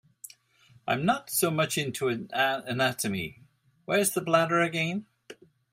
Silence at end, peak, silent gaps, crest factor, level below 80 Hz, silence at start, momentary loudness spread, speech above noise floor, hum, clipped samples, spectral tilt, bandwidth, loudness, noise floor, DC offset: 0.4 s; -8 dBFS; none; 22 dB; -68 dBFS; 0.25 s; 15 LU; 33 dB; none; under 0.1%; -4 dB/octave; 16 kHz; -27 LUFS; -61 dBFS; under 0.1%